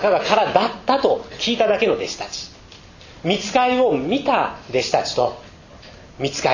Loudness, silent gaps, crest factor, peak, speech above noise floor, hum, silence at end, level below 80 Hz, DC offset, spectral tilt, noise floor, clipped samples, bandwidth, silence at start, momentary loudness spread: -20 LUFS; none; 18 dB; -2 dBFS; 24 dB; none; 0 s; -50 dBFS; under 0.1%; -4 dB/octave; -43 dBFS; under 0.1%; 7.4 kHz; 0 s; 11 LU